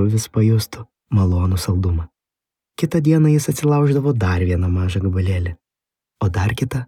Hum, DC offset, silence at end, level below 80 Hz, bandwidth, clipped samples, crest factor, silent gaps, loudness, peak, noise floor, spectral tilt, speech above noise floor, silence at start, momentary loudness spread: none; under 0.1%; 0 s; -40 dBFS; 15.5 kHz; under 0.1%; 14 dB; none; -19 LUFS; -4 dBFS; -87 dBFS; -7 dB/octave; 70 dB; 0 s; 10 LU